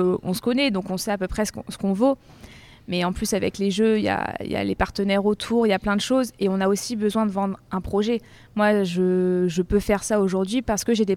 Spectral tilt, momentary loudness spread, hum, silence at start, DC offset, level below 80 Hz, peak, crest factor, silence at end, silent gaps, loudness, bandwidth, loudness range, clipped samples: -5 dB/octave; 6 LU; none; 0 s; under 0.1%; -44 dBFS; -6 dBFS; 16 dB; 0 s; none; -23 LUFS; 16 kHz; 2 LU; under 0.1%